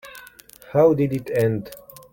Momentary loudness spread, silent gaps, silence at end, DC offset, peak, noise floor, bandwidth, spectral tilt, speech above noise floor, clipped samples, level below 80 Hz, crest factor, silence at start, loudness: 23 LU; none; 0.35 s; under 0.1%; -4 dBFS; -46 dBFS; 17 kHz; -8 dB/octave; 27 dB; under 0.1%; -56 dBFS; 18 dB; 0.05 s; -21 LUFS